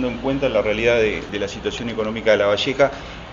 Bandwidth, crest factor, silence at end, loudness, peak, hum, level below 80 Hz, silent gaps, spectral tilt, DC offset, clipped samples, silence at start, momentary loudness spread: 7.6 kHz; 18 dB; 0 s; -20 LUFS; -2 dBFS; none; -40 dBFS; none; -5 dB/octave; under 0.1%; under 0.1%; 0 s; 8 LU